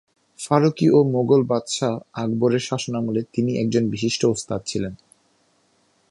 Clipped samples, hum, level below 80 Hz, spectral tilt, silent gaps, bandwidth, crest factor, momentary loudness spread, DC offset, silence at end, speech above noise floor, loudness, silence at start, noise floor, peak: under 0.1%; none; -56 dBFS; -6 dB/octave; none; 11.5 kHz; 20 dB; 10 LU; under 0.1%; 1.15 s; 43 dB; -21 LUFS; 0.4 s; -63 dBFS; -2 dBFS